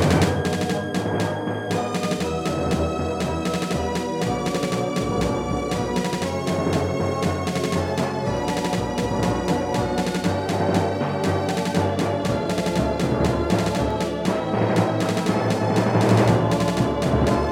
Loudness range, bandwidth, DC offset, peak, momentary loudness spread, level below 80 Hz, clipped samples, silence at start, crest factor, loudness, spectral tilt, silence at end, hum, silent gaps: 3 LU; 16.5 kHz; under 0.1%; -6 dBFS; 5 LU; -40 dBFS; under 0.1%; 0 s; 16 dB; -23 LUFS; -6 dB/octave; 0 s; none; none